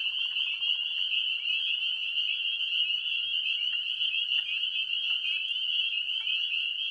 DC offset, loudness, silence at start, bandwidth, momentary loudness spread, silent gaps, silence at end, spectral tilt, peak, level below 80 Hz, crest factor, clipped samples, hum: under 0.1%; -27 LUFS; 0 s; 11 kHz; 2 LU; none; 0 s; 2.5 dB/octave; -16 dBFS; -80 dBFS; 14 dB; under 0.1%; none